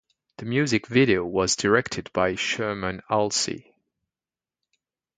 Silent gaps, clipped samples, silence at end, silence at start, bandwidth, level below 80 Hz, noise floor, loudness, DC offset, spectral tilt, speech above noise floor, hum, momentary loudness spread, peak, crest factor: none; under 0.1%; 1.55 s; 0.4 s; 9.6 kHz; -54 dBFS; under -90 dBFS; -24 LUFS; under 0.1%; -4 dB/octave; over 66 dB; none; 9 LU; -6 dBFS; 20 dB